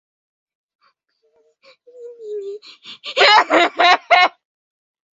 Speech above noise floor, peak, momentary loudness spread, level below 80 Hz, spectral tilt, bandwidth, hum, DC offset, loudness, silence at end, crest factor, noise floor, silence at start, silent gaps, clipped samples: 49 dB; 0 dBFS; 23 LU; -70 dBFS; -0.5 dB/octave; 7.8 kHz; none; under 0.1%; -13 LUFS; 0.85 s; 18 dB; -64 dBFS; 2 s; none; under 0.1%